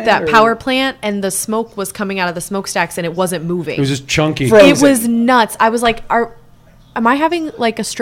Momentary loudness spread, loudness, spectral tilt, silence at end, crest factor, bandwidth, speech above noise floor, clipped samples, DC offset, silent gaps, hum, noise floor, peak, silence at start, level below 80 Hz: 10 LU; -14 LUFS; -4.5 dB/octave; 0 s; 14 dB; 16.5 kHz; 30 dB; 0.4%; under 0.1%; none; none; -44 dBFS; 0 dBFS; 0 s; -44 dBFS